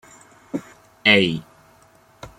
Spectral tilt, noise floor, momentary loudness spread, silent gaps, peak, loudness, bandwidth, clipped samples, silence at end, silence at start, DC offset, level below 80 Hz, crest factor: -5 dB/octave; -54 dBFS; 18 LU; none; -2 dBFS; -18 LUFS; 16 kHz; under 0.1%; 0.1 s; 0.55 s; under 0.1%; -58 dBFS; 22 dB